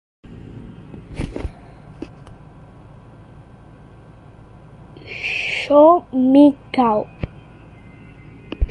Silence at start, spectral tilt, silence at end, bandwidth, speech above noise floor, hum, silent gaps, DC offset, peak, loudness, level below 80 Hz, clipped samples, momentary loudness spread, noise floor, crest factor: 0.3 s; -7 dB/octave; 0 s; 9.4 kHz; 30 dB; none; none; under 0.1%; -2 dBFS; -16 LUFS; -36 dBFS; under 0.1%; 26 LU; -43 dBFS; 20 dB